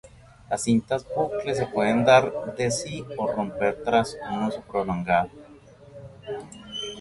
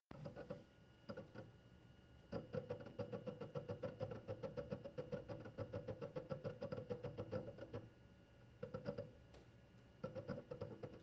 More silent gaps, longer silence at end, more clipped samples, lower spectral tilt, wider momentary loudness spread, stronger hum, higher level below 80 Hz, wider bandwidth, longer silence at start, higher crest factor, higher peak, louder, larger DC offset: neither; about the same, 0 s vs 0 s; neither; second, -5 dB/octave vs -7 dB/octave; about the same, 17 LU vs 17 LU; neither; first, -54 dBFS vs -72 dBFS; first, 11.5 kHz vs 7.6 kHz; about the same, 0.05 s vs 0.1 s; about the same, 22 dB vs 20 dB; first, -4 dBFS vs -32 dBFS; first, -25 LUFS vs -52 LUFS; neither